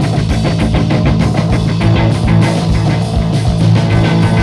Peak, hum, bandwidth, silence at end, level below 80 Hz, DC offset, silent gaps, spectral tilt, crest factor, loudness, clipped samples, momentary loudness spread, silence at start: 0 dBFS; none; 11 kHz; 0 s; -22 dBFS; under 0.1%; none; -7 dB/octave; 10 dB; -12 LUFS; under 0.1%; 3 LU; 0 s